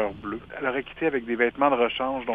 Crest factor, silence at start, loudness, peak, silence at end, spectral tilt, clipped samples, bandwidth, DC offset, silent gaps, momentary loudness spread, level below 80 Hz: 20 dB; 0 s; -26 LUFS; -6 dBFS; 0 s; -7.5 dB/octave; under 0.1%; 4.6 kHz; under 0.1%; none; 9 LU; -54 dBFS